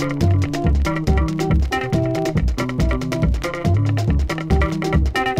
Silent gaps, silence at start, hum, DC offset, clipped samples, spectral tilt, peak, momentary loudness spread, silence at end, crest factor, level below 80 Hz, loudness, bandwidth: none; 0 s; none; under 0.1%; under 0.1%; -7 dB/octave; -4 dBFS; 3 LU; 0 s; 14 dB; -24 dBFS; -20 LUFS; 15 kHz